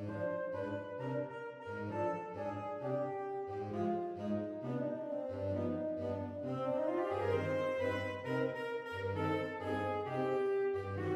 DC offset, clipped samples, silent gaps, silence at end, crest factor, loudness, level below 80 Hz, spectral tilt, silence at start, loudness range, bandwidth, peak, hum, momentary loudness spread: under 0.1%; under 0.1%; none; 0 s; 16 dB; -38 LUFS; -74 dBFS; -8 dB/octave; 0 s; 3 LU; 13.5 kHz; -22 dBFS; none; 6 LU